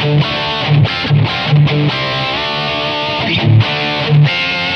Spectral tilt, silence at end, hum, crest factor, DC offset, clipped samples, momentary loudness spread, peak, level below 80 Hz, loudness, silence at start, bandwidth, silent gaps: -7 dB/octave; 0 s; none; 12 dB; under 0.1%; under 0.1%; 5 LU; 0 dBFS; -40 dBFS; -13 LUFS; 0 s; 6.4 kHz; none